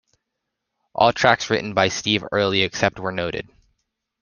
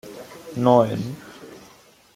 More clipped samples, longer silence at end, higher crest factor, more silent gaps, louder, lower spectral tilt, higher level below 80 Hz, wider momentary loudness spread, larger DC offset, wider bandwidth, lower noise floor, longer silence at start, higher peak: neither; first, 0.8 s vs 0.6 s; about the same, 22 dB vs 22 dB; neither; about the same, -20 LUFS vs -20 LUFS; second, -4 dB/octave vs -7.5 dB/octave; first, -54 dBFS vs -62 dBFS; second, 10 LU vs 25 LU; neither; second, 10 kHz vs 16 kHz; first, -80 dBFS vs -52 dBFS; first, 0.95 s vs 0.05 s; about the same, -2 dBFS vs -2 dBFS